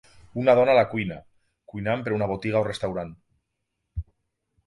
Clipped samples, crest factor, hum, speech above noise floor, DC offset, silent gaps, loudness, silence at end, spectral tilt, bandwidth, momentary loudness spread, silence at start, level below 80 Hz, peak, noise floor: under 0.1%; 20 dB; none; 56 dB; under 0.1%; none; -24 LUFS; 0.65 s; -7 dB/octave; 11.5 kHz; 20 LU; 0.35 s; -48 dBFS; -6 dBFS; -79 dBFS